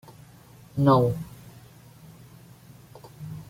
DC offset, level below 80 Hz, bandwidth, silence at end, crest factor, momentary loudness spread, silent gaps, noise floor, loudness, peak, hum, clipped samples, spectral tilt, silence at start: under 0.1%; -56 dBFS; 16.5 kHz; 0.05 s; 22 dB; 28 LU; none; -51 dBFS; -23 LUFS; -8 dBFS; none; under 0.1%; -8.5 dB/octave; 0.75 s